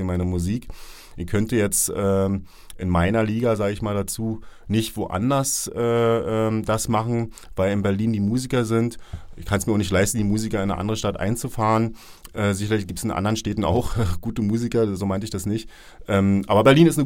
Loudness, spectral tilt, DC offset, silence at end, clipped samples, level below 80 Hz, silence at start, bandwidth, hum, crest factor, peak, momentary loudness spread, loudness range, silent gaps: -22 LUFS; -5.5 dB/octave; under 0.1%; 0 s; under 0.1%; -40 dBFS; 0 s; 17 kHz; none; 20 dB; -2 dBFS; 10 LU; 2 LU; none